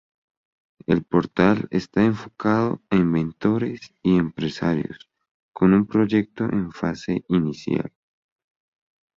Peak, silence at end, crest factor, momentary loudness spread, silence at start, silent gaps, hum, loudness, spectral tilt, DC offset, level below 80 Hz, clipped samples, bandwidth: -2 dBFS; 1.3 s; 20 dB; 8 LU; 0.9 s; 5.31-5.52 s; none; -22 LUFS; -8 dB/octave; under 0.1%; -52 dBFS; under 0.1%; 7.4 kHz